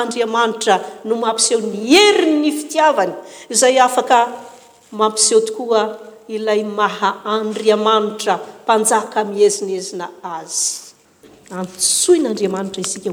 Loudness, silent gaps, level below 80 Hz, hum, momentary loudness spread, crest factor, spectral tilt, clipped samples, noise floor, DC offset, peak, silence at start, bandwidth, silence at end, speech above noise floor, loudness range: -16 LUFS; none; -68 dBFS; none; 15 LU; 16 dB; -2 dB/octave; under 0.1%; -47 dBFS; under 0.1%; 0 dBFS; 0 s; over 20 kHz; 0 s; 31 dB; 5 LU